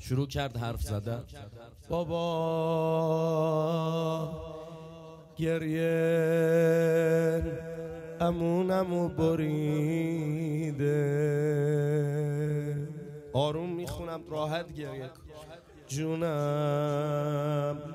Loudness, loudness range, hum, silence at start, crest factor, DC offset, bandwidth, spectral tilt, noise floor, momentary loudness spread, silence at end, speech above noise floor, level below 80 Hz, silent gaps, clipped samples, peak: -30 LUFS; 6 LU; none; 0 s; 16 dB; under 0.1%; 15 kHz; -7 dB/octave; -50 dBFS; 15 LU; 0 s; 21 dB; -52 dBFS; none; under 0.1%; -14 dBFS